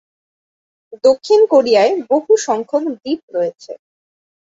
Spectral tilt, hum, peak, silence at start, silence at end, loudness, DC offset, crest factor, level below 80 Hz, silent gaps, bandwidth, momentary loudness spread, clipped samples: -3.5 dB/octave; none; -2 dBFS; 0.9 s; 0.65 s; -15 LUFS; under 0.1%; 14 dB; -64 dBFS; 3.23-3.28 s; 7.8 kHz; 12 LU; under 0.1%